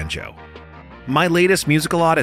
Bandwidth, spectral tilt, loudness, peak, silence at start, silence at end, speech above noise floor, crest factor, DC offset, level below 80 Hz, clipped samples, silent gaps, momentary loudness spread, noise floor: 16 kHz; -5 dB/octave; -17 LUFS; -4 dBFS; 0 s; 0 s; 22 dB; 16 dB; under 0.1%; -42 dBFS; under 0.1%; none; 17 LU; -39 dBFS